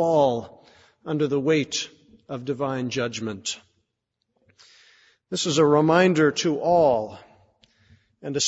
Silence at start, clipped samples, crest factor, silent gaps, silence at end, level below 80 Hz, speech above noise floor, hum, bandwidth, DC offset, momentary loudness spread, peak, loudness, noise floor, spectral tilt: 0 s; under 0.1%; 18 dB; none; 0 s; -64 dBFS; 57 dB; none; 8 kHz; under 0.1%; 17 LU; -6 dBFS; -23 LUFS; -79 dBFS; -4.5 dB/octave